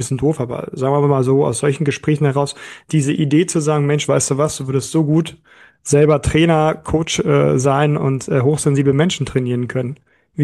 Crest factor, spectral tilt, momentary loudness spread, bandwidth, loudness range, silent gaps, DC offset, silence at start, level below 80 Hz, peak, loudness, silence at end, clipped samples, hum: 14 dB; -6 dB/octave; 8 LU; 12.5 kHz; 2 LU; none; under 0.1%; 0 s; -42 dBFS; -2 dBFS; -16 LUFS; 0 s; under 0.1%; none